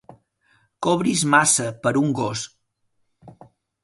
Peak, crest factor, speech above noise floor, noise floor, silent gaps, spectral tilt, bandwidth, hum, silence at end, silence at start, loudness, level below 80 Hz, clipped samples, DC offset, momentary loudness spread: -2 dBFS; 20 dB; 50 dB; -70 dBFS; none; -3.5 dB/octave; 11.5 kHz; none; 0.55 s; 0.8 s; -20 LUFS; -62 dBFS; under 0.1%; under 0.1%; 12 LU